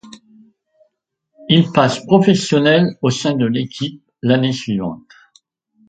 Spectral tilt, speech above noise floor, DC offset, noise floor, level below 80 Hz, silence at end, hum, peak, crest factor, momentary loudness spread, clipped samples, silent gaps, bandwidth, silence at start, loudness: -6 dB/octave; 55 dB; under 0.1%; -70 dBFS; -56 dBFS; 0.9 s; none; 0 dBFS; 18 dB; 13 LU; under 0.1%; none; 9.2 kHz; 0.05 s; -16 LUFS